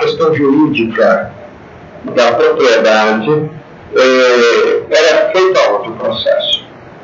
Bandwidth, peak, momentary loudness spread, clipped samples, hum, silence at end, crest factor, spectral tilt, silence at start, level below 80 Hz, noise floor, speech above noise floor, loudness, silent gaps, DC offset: 7.6 kHz; 0 dBFS; 8 LU; under 0.1%; none; 0 s; 12 dB; -4.5 dB/octave; 0 s; -52 dBFS; -34 dBFS; 24 dB; -11 LUFS; none; under 0.1%